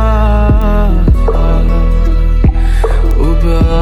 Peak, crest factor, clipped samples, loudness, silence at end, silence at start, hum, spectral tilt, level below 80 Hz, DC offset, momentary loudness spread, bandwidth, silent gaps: 0 dBFS; 8 dB; under 0.1%; -12 LUFS; 0 s; 0 s; none; -8.5 dB/octave; -8 dBFS; under 0.1%; 3 LU; 4.9 kHz; none